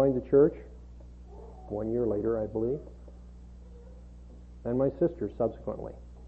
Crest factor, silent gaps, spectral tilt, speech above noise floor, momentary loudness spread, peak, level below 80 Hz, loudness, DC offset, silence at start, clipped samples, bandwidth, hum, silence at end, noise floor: 18 dB; none; -11 dB/octave; 19 dB; 26 LU; -12 dBFS; -48 dBFS; -29 LUFS; under 0.1%; 0 s; under 0.1%; 3.8 kHz; 60 Hz at -45 dBFS; 0 s; -48 dBFS